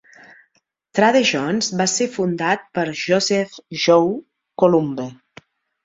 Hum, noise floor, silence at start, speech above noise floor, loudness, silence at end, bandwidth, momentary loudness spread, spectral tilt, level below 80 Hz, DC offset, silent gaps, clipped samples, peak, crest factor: none; -66 dBFS; 0.95 s; 48 dB; -19 LUFS; 0.7 s; 8 kHz; 12 LU; -4 dB/octave; -62 dBFS; under 0.1%; none; under 0.1%; -2 dBFS; 18 dB